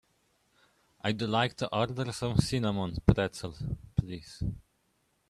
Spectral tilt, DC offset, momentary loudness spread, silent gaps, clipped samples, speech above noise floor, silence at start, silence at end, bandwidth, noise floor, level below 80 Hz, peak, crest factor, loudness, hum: -6 dB/octave; under 0.1%; 11 LU; none; under 0.1%; 43 dB; 1.05 s; 0.7 s; 13 kHz; -74 dBFS; -46 dBFS; -6 dBFS; 26 dB; -31 LUFS; none